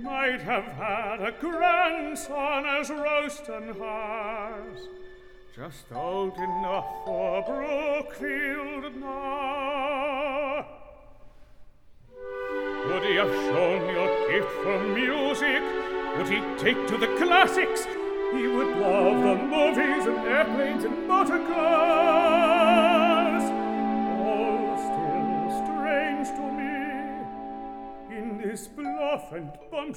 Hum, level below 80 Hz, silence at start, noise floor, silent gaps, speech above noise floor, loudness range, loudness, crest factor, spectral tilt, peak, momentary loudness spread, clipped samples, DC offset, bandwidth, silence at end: none; -54 dBFS; 0 s; -50 dBFS; none; 24 dB; 11 LU; -26 LUFS; 22 dB; -4.5 dB/octave; -4 dBFS; 15 LU; under 0.1%; under 0.1%; 17 kHz; 0 s